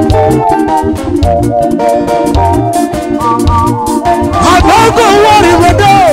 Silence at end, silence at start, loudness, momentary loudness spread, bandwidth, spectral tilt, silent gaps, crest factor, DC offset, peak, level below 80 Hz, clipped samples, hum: 0 s; 0 s; -8 LUFS; 7 LU; 16.5 kHz; -5.5 dB/octave; none; 8 dB; under 0.1%; 0 dBFS; -20 dBFS; 0.3%; none